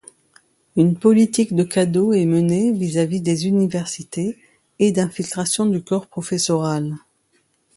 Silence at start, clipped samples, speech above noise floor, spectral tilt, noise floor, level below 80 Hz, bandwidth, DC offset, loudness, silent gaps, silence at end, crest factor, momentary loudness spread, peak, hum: 0.75 s; under 0.1%; 46 dB; -6 dB/octave; -64 dBFS; -60 dBFS; 11.5 kHz; under 0.1%; -19 LUFS; none; 0.8 s; 16 dB; 10 LU; -2 dBFS; none